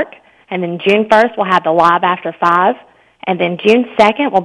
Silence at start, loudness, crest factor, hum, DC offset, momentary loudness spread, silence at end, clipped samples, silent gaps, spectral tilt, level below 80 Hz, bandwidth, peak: 0 s; -13 LUFS; 14 dB; none; under 0.1%; 12 LU; 0 s; 0.7%; none; -6 dB/octave; -56 dBFS; 11 kHz; 0 dBFS